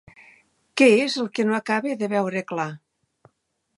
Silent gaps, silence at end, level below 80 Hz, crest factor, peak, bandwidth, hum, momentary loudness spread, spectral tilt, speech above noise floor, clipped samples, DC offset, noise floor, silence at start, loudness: none; 1 s; -72 dBFS; 20 dB; -4 dBFS; 11.5 kHz; none; 13 LU; -5 dB/octave; 51 dB; under 0.1%; under 0.1%; -72 dBFS; 0.75 s; -22 LUFS